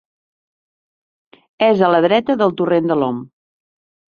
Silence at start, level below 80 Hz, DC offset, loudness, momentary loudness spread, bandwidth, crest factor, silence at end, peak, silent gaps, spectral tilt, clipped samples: 1.6 s; -62 dBFS; under 0.1%; -16 LUFS; 7 LU; 6.8 kHz; 16 dB; 0.85 s; -2 dBFS; none; -8 dB/octave; under 0.1%